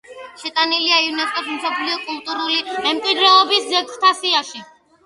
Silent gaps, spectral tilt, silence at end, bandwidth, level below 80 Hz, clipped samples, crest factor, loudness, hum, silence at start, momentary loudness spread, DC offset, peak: none; 0 dB/octave; 0.4 s; 11.5 kHz; -70 dBFS; under 0.1%; 18 dB; -17 LUFS; none; 0.1 s; 13 LU; under 0.1%; 0 dBFS